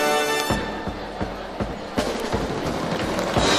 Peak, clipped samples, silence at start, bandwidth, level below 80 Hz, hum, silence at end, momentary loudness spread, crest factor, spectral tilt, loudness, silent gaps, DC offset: -4 dBFS; under 0.1%; 0 s; 16 kHz; -38 dBFS; none; 0 s; 9 LU; 20 dB; -4 dB/octave; -25 LUFS; none; under 0.1%